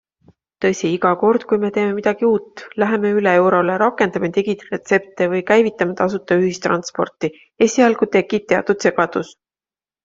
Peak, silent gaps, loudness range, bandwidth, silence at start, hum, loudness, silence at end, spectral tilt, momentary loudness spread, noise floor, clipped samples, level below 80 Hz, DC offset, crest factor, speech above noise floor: -2 dBFS; none; 2 LU; 7.8 kHz; 0.6 s; none; -18 LUFS; 0.75 s; -5.5 dB/octave; 8 LU; under -90 dBFS; under 0.1%; -60 dBFS; under 0.1%; 16 dB; over 73 dB